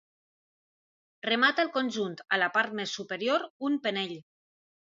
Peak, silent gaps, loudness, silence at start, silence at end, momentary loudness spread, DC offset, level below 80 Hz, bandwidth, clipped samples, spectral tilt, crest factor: -10 dBFS; 3.50-3.60 s; -29 LUFS; 1.25 s; 0.65 s; 10 LU; under 0.1%; -82 dBFS; 7.8 kHz; under 0.1%; -3.5 dB/octave; 20 dB